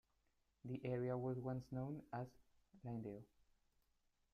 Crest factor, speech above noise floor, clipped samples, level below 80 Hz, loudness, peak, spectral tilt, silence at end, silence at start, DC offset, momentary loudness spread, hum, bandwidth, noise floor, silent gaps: 16 dB; 36 dB; under 0.1%; -76 dBFS; -48 LUFS; -32 dBFS; -9.5 dB/octave; 1.1 s; 0.65 s; under 0.1%; 13 LU; none; 6.6 kHz; -83 dBFS; none